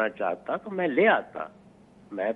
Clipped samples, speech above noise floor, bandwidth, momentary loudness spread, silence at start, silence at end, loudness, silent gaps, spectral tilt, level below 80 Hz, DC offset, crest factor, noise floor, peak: under 0.1%; 28 dB; 4.4 kHz; 17 LU; 0 s; 0 s; -26 LUFS; none; -7.5 dB/octave; -70 dBFS; under 0.1%; 20 dB; -54 dBFS; -8 dBFS